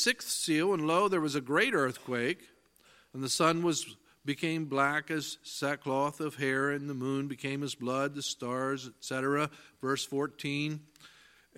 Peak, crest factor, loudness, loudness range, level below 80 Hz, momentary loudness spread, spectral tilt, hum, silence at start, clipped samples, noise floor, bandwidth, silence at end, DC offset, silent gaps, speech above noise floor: -12 dBFS; 22 dB; -32 LUFS; 4 LU; -76 dBFS; 10 LU; -4 dB/octave; none; 0 s; under 0.1%; -63 dBFS; 16.5 kHz; 0.5 s; under 0.1%; none; 31 dB